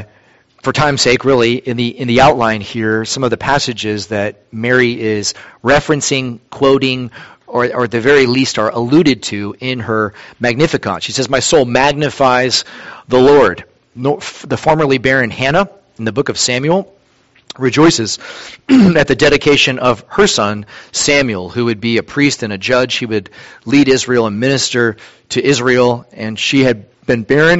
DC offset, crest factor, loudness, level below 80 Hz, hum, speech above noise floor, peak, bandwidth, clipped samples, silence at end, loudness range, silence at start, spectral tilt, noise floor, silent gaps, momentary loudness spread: under 0.1%; 14 dB; -13 LUFS; -42 dBFS; none; 39 dB; 0 dBFS; 8.2 kHz; under 0.1%; 0 s; 3 LU; 0 s; -4.5 dB/octave; -52 dBFS; none; 11 LU